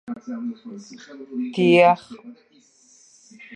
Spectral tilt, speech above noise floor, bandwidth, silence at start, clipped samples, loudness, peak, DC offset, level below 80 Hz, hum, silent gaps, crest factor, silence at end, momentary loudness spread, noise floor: -6.5 dB/octave; 34 dB; 9.8 kHz; 0.1 s; under 0.1%; -20 LUFS; -2 dBFS; under 0.1%; -74 dBFS; none; none; 20 dB; 0 s; 26 LU; -55 dBFS